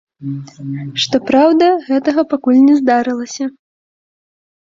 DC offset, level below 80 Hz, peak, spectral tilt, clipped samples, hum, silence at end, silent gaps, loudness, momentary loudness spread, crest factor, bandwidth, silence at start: under 0.1%; -58 dBFS; -2 dBFS; -5.5 dB/octave; under 0.1%; none; 1.25 s; none; -13 LUFS; 16 LU; 14 dB; 7.6 kHz; 0.2 s